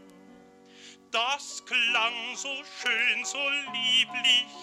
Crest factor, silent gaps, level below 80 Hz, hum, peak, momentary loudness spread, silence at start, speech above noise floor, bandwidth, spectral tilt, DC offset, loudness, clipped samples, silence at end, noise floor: 18 dB; none; -80 dBFS; none; -12 dBFS; 11 LU; 0 s; 25 dB; 15 kHz; 1 dB/octave; under 0.1%; -25 LUFS; under 0.1%; 0 s; -53 dBFS